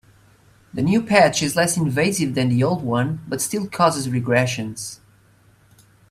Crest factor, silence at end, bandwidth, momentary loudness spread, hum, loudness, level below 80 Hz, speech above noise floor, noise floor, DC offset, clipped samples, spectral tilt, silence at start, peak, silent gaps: 20 dB; 1.15 s; 16 kHz; 10 LU; none; -20 LUFS; -54 dBFS; 35 dB; -55 dBFS; under 0.1%; under 0.1%; -5 dB/octave; 0.75 s; 0 dBFS; none